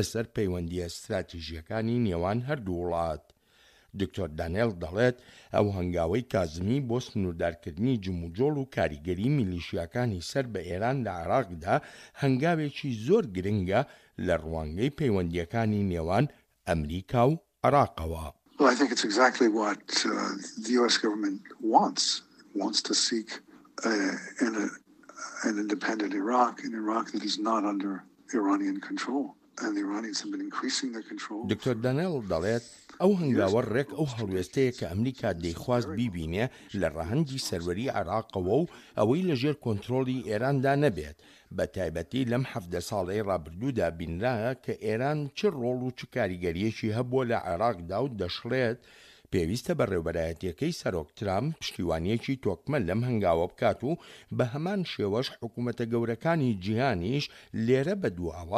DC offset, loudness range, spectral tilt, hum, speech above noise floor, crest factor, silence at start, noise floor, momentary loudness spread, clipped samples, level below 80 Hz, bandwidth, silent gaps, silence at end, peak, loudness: under 0.1%; 5 LU; -5.5 dB/octave; none; 33 dB; 22 dB; 0 s; -62 dBFS; 9 LU; under 0.1%; -52 dBFS; 14.5 kHz; none; 0 s; -8 dBFS; -29 LUFS